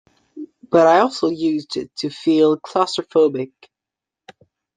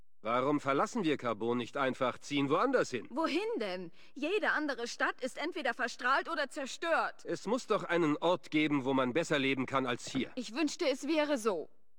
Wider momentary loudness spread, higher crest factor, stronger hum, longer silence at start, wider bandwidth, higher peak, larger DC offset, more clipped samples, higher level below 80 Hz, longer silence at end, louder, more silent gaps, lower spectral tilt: first, 17 LU vs 7 LU; about the same, 18 dB vs 16 dB; neither; about the same, 0.35 s vs 0.25 s; second, 9.4 kHz vs 16.5 kHz; first, -2 dBFS vs -16 dBFS; second, under 0.1% vs 0.3%; neither; first, -66 dBFS vs -74 dBFS; first, 1.3 s vs 0.35 s; first, -18 LUFS vs -33 LUFS; neither; about the same, -5.5 dB/octave vs -4.5 dB/octave